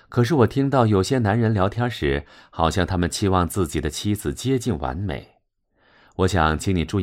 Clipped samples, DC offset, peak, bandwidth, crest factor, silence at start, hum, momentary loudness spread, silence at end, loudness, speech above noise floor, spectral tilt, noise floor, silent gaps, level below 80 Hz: under 0.1%; under 0.1%; -2 dBFS; 16 kHz; 20 dB; 0.1 s; none; 9 LU; 0 s; -22 LUFS; 45 dB; -6 dB/octave; -66 dBFS; none; -38 dBFS